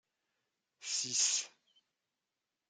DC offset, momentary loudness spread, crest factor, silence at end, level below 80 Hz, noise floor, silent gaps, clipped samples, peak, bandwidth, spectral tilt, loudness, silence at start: under 0.1%; 18 LU; 22 dB; 1.2 s; under -90 dBFS; -89 dBFS; none; under 0.1%; -18 dBFS; 11.5 kHz; 2 dB/octave; -33 LUFS; 0.8 s